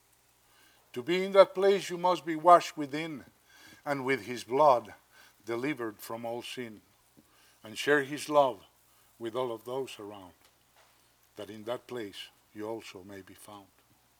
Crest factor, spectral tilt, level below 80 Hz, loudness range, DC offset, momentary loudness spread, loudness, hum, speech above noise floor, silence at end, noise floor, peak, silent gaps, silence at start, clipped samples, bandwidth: 24 dB; -4.5 dB/octave; -78 dBFS; 16 LU; under 0.1%; 24 LU; -29 LUFS; none; 37 dB; 0.6 s; -66 dBFS; -6 dBFS; none; 0.95 s; under 0.1%; 18.5 kHz